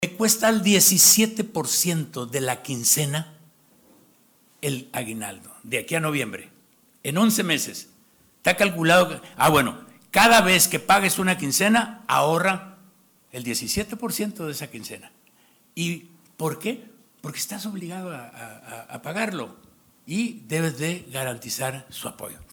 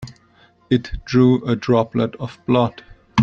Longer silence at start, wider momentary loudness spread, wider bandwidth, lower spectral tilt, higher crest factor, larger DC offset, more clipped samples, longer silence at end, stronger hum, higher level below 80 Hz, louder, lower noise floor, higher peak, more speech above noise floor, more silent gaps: about the same, 0 s vs 0 s; first, 20 LU vs 9 LU; first, over 20 kHz vs 7.2 kHz; second, -3 dB/octave vs -7.5 dB/octave; about the same, 18 dB vs 16 dB; neither; neither; about the same, 0.1 s vs 0 s; neither; second, -58 dBFS vs -40 dBFS; about the same, -21 LUFS vs -19 LUFS; first, -59 dBFS vs -54 dBFS; second, -6 dBFS vs -2 dBFS; about the same, 36 dB vs 36 dB; neither